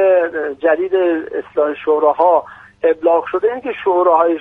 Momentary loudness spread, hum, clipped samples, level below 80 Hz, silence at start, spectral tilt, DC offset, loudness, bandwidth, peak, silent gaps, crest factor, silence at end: 7 LU; none; under 0.1%; -58 dBFS; 0 s; -7 dB/octave; under 0.1%; -16 LUFS; 3.9 kHz; 0 dBFS; none; 14 dB; 0 s